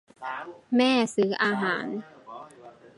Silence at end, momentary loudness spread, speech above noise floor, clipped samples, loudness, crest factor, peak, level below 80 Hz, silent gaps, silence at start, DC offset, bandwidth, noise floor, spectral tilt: 0.1 s; 22 LU; 24 dB; under 0.1%; -26 LUFS; 18 dB; -10 dBFS; -78 dBFS; none; 0.2 s; under 0.1%; 11.5 kHz; -50 dBFS; -4.5 dB/octave